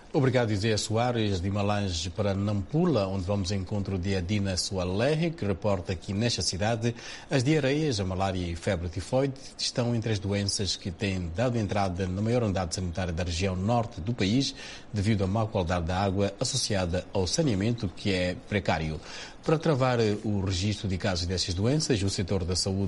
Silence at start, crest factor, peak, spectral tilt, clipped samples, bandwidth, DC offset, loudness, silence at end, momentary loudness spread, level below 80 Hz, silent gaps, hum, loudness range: 0 s; 18 dB; -10 dBFS; -5 dB/octave; under 0.1%; 11.5 kHz; under 0.1%; -28 LUFS; 0 s; 6 LU; -46 dBFS; none; none; 1 LU